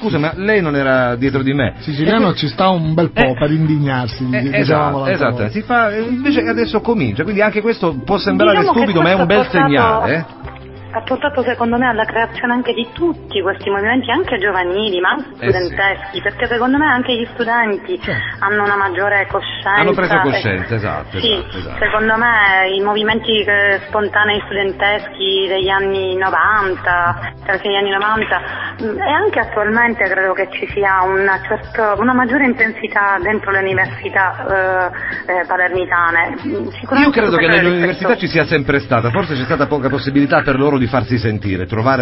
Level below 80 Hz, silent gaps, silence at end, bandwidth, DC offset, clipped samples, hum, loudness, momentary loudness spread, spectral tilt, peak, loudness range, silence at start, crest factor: -38 dBFS; none; 0 s; 5.8 kHz; 0.2%; under 0.1%; none; -15 LUFS; 7 LU; -9.5 dB/octave; 0 dBFS; 3 LU; 0 s; 16 dB